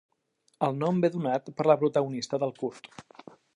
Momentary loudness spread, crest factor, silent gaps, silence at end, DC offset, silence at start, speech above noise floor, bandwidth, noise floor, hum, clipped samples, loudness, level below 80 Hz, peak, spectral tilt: 17 LU; 20 dB; none; 0.55 s; under 0.1%; 0.6 s; 44 dB; 11 kHz; -72 dBFS; none; under 0.1%; -28 LUFS; -76 dBFS; -8 dBFS; -7 dB/octave